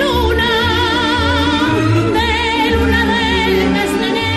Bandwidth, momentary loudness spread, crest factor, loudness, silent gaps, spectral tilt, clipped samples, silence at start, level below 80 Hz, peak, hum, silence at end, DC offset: 13 kHz; 1 LU; 10 dB; -14 LUFS; none; -5 dB/octave; under 0.1%; 0 s; -26 dBFS; -2 dBFS; none; 0 s; under 0.1%